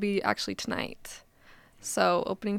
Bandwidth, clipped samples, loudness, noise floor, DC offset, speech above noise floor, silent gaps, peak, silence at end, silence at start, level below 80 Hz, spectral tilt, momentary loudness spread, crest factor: 16.5 kHz; under 0.1%; -30 LUFS; -57 dBFS; under 0.1%; 27 dB; none; -8 dBFS; 0 s; 0 s; -62 dBFS; -4 dB/octave; 19 LU; 22 dB